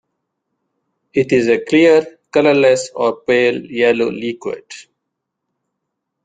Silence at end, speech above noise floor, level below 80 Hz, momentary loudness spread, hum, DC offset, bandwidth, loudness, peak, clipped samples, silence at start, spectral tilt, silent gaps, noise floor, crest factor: 1.45 s; 62 dB; -58 dBFS; 12 LU; none; under 0.1%; 9.4 kHz; -15 LUFS; -2 dBFS; under 0.1%; 1.15 s; -5 dB/octave; none; -77 dBFS; 16 dB